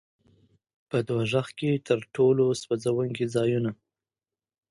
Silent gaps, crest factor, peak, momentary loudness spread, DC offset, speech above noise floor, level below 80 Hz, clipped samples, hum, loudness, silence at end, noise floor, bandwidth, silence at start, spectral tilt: none; 18 dB; -10 dBFS; 7 LU; under 0.1%; over 65 dB; -66 dBFS; under 0.1%; none; -26 LUFS; 0.95 s; under -90 dBFS; 11.5 kHz; 0.95 s; -6.5 dB/octave